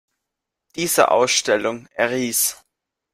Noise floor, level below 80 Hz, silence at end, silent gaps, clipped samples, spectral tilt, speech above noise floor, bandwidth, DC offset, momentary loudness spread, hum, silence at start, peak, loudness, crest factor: -82 dBFS; -64 dBFS; 0.6 s; none; under 0.1%; -2 dB/octave; 63 dB; 16 kHz; under 0.1%; 11 LU; none; 0.75 s; -2 dBFS; -19 LUFS; 20 dB